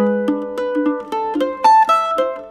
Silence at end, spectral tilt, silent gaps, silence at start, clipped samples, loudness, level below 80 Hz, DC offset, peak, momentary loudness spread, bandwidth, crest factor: 0 s; -5.5 dB/octave; none; 0 s; under 0.1%; -17 LUFS; -58 dBFS; under 0.1%; -2 dBFS; 10 LU; 13.5 kHz; 14 dB